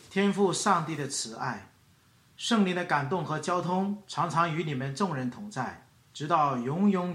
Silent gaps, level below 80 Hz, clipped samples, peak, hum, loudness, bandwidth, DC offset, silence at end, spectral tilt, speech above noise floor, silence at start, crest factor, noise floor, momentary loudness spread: none; -72 dBFS; under 0.1%; -10 dBFS; none; -29 LUFS; 12.5 kHz; under 0.1%; 0 s; -5 dB/octave; 33 dB; 0.05 s; 20 dB; -62 dBFS; 10 LU